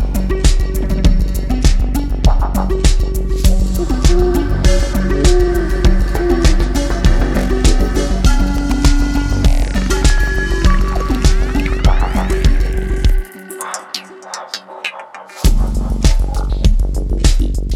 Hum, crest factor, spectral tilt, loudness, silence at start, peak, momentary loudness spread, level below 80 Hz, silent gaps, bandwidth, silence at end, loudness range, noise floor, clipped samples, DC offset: none; 12 dB; -5.5 dB/octave; -16 LUFS; 0 s; 0 dBFS; 9 LU; -14 dBFS; none; 15 kHz; 0 s; 5 LU; -32 dBFS; under 0.1%; under 0.1%